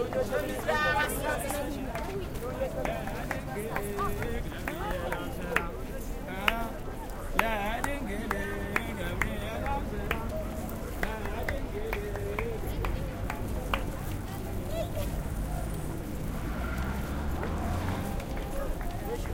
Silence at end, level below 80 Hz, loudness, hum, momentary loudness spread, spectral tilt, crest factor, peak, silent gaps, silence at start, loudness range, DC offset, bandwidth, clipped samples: 0 s; -38 dBFS; -33 LUFS; none; 7 LU; -5 dB/octave; 28 dB; -4 dBFS; none; 0 s; 3 LU; under 0.1%; 17 kHz; under 0.1%